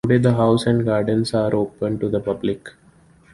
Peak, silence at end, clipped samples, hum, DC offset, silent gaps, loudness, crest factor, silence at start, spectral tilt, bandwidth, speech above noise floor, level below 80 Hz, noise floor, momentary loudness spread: -4 dBFS; 0.65 s; under 0.1%; none; under 0.1%; none; -20 LUFS; 16 dB; 0.05 s; -7.5 dB/octave; 11.5 kHz; 33 dB; -50 dBFS; -52 dBFS; 8 LU